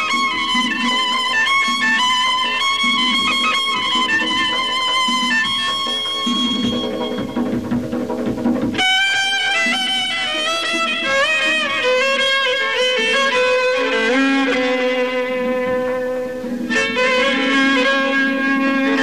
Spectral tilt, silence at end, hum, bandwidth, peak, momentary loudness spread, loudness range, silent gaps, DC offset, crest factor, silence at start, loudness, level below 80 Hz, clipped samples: -2.5 dB/octave; 0 s; none; 15 kHz; -6 dBFS; 7 LU; 3 LU; none; 0.6%; 10 dB; 0 s; -16 LUFS; -52 dBFS; under 0.1%